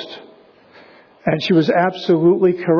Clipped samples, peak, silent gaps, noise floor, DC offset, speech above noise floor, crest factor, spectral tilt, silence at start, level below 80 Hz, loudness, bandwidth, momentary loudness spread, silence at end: under 0.1%; -4 dBFS; none; -47 dBFS; under 0.1%; 32 dB; 14 dB; -8 dB/octave; 0 s; -62 dBFS; -16 LUFS; 5.4 kHz; 14 LU; 0 s